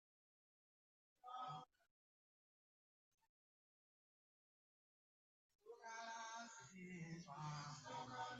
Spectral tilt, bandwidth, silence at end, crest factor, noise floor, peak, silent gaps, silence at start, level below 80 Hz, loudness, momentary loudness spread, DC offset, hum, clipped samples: -3.5 dB/octave; 8 kHz; 0 s; 20 dB; under -90 dBFS; -38 dBFS; 1.91-3.18 s, 3.29-5.59 s; 1.25 s; under -90 dBFS; -54 LUFS; 8 LU; under 0.1%; none; under 0.1%